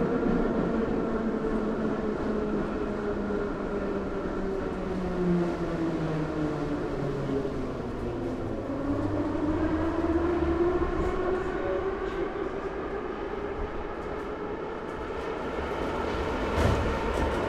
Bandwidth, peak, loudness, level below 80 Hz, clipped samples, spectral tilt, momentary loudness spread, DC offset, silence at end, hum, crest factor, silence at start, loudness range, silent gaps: 12 kHz; -12 dBFS; -30 LUFS; -40 dBFS; under 0.1%; -7.5 dB/octave; 7 LU; under 0.1%; 0 s; none; 18 dB; 0 s; 5 LU; none